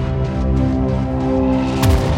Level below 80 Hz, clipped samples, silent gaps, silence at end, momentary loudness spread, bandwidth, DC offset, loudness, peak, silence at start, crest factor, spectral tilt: -22 dBFS; under 0.1%; none; 0 s; 4 LU; 16.5 kHz; under 0.1%; -18 LUFS; -2 dBFS; 0 s; 14 dB; -7.5 dB/octave